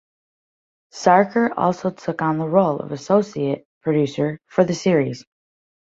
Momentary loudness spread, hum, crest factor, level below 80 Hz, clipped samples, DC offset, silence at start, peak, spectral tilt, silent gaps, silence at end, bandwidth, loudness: 10 LU; none; 18 dB; -62 dBFS; under 0.1%; under 0.1%; 0.95 s; -2 dBFS; -6.5 dB/octave; 3.65-3.81 s; 0.65 s; 7.8 kHz; -20 LUFS